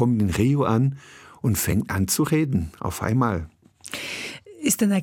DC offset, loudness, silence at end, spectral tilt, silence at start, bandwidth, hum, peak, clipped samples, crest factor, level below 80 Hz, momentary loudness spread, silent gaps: under 0.1%; -23 LUFS; 0 s; -5.5 dB/octave; 0 s; 17.5 kHz; none; -6 dBFS; under 0.1%; 16 dB; -48 dBFS; 13 LU; none